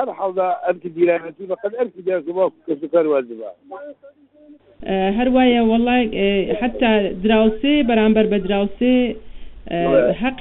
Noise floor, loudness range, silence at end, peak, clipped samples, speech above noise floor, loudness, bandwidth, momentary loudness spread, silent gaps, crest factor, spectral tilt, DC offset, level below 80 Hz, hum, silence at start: -47 dBFS; 6 LU; 0 s; -2 dBFS; under 0.1%; 29 dB; -18 LUFS; 4.1 kHz; 13 LU; none; 16 dB; -4.5 dB/octave; under 0.1%; -42 dBFS; none; 0 s